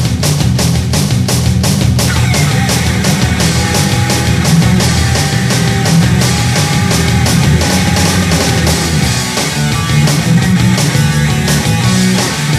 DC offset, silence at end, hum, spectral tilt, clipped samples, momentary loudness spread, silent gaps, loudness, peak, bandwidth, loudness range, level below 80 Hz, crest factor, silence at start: under 0.1%; 0 s; none; -4.5 dB/octave; under 0.1%; 2 LU; none; -11 LUFS; 0 dBFS; 15.5 kHz; 1 LU; -24 dBFS; 10 dB; 0 s